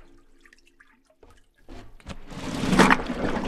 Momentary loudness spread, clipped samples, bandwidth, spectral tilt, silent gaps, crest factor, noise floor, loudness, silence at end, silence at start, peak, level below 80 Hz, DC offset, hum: 25 LU; under 0.1%; 14 kHz; -5 dB/octave; none; 28 dB; -58 dBFS; -22 LUFS; 0 s; 1.7 s; 0 dBFS; -40 dBFS; under 0.1%; none